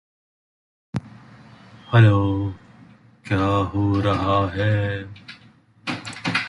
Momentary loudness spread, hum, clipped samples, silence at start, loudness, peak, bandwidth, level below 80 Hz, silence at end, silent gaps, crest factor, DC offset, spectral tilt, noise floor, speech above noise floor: 17 LU; none; under 0.1%; 0.95 s; -21 LUFS; -2 dBFS; 10.5 kHz; -42 dBFS; 0 s; none; 20 dB; under 0.1%; -7.5 dB/octave; -52 dBFS; 34 dB